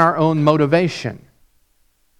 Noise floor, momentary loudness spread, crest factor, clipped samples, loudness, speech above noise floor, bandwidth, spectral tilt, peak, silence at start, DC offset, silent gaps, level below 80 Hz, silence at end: -60 dBFS; 13 LU; 18 dB; under 0.1%; -17 LUFS; 44 dB; 10.5 kHz; -7 dB/octave; 0 dBFS; 0 s; under 0.1%; none; -56 dBFS; 1 s